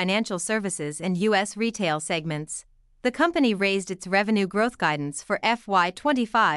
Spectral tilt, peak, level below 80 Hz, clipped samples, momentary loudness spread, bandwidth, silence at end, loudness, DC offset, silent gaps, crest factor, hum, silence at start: -4 dB/octave; -8 dBFS; -60 dBFS; under 0.1%; 8 LU; 12 kHz; 0 s; -24 LUFS; under 0.1%; none; 16 dB; none; 0 s